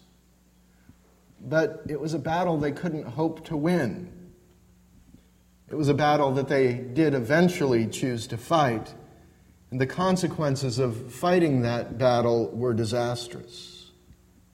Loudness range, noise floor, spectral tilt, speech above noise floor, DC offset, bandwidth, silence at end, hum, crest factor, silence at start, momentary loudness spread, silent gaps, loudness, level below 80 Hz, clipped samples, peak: 5 LU; -60 dBFS; -6.5 dB/octave; 35 dB; under 0.1%; 16 kHz; 0.7 s; none; 20 dB; 1.4 s; 13 LU; none; -25 LUFS; -56 dBFS; under 0.1%; -8 dBFS